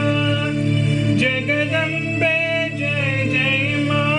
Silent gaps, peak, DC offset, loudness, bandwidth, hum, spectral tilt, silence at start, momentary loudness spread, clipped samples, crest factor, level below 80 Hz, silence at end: none; -8 dBFS; under 0.1%; -18 LUFS; 10.5 kHz; none; -6 dB/octave; 0 s; 3 LU; under 0.1%; 12 dB; -48 dBFS; 0 s